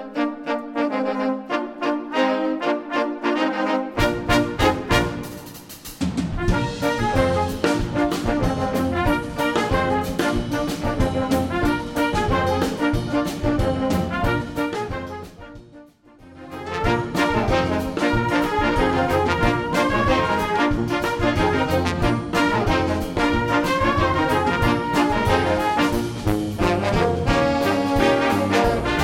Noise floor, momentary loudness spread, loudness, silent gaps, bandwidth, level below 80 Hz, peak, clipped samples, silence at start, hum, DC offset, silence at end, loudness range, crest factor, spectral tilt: -47 dBFS; 6 LU; -21 LUFS; none; 17 kHz; -34 dBFS; -2 dBFS; under 0.1%; 0 s; none; under 0.1%; 0 s; 4 LU; 18 dB; -6 dB/octave